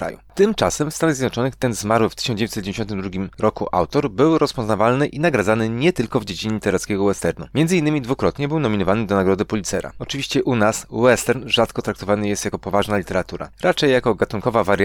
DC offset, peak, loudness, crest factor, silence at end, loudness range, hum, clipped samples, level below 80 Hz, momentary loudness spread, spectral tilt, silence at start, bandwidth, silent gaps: under 0.1%; -4 dBFS; -20 LUFS; 16 dB; 0 s; 2 LU; none; under 0.1%; -44 dBFS; 7 LU; -5 dB/octave; 0 s; 19 kHz; none